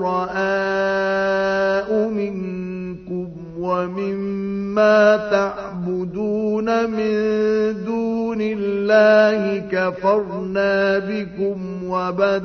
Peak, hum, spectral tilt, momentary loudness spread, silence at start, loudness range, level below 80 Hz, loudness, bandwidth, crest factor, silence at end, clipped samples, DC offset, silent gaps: -2 dBFS; none; -6.5 dB/octave; 13 LU; 0 s; 4 LU; -52 dBFS; -20 LUFS; 6.6 kHz; 18 dB; 0 s; under 0.1%; under 0.1%; none